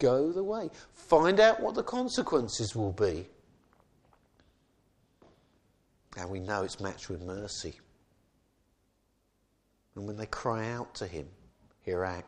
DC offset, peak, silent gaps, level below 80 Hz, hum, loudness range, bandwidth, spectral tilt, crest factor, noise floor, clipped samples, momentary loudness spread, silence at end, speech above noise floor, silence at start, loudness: under 0.1%; -8 dBFS; none; -60 dBFS; none; 16 LU; 10.5 kHz; -5 dB/octave; 24 dB; -73 dBFS; under 0.1%; 20 LU; 0 s; 43 dB; 0 s; -31 LUFS